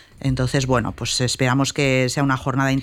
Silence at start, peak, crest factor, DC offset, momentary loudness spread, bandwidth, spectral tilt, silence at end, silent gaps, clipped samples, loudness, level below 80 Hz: 0.2 s; -6 dBFS; 14 dB; under 0.1%; 4 LU; 15 kHz; -5 dB/octave; 0 s; none; under 0.1%; -20 LUFS; -40 dBFS